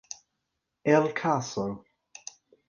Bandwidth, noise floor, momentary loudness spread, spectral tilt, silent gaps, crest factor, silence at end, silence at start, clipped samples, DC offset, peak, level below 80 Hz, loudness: 9.6 kHz; -82 dBFS; 21 LU; -5.5 dB/octave; none; 24 dB; 0.9 s; 0.85 s; under 0.1%; under 0.1%; -6 dBFS; -68 dBFS; -27 LUFS